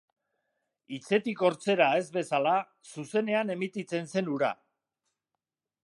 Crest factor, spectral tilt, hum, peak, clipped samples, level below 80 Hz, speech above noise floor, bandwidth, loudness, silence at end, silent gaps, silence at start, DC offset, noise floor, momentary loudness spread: 20 dB; -5.5 dB/octave; none; -10 dBFS; under 0.1%; -82 dBFS; 59 dB; 11.5 kHz; -29 LUFS; 1.3 s; none; 0.9 s; under 0.1%; -88 dBFS; 17 LU